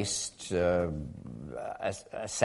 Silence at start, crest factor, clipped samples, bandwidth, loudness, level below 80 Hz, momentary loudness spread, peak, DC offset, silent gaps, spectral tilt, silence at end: 0 s; 22 dB; under 0.1%; 11.5 kHz; -33 LUFS; -52 dBFS; 14 LU; -10 dBFS; under 0.1%; none; -4 dB/octave; 0 s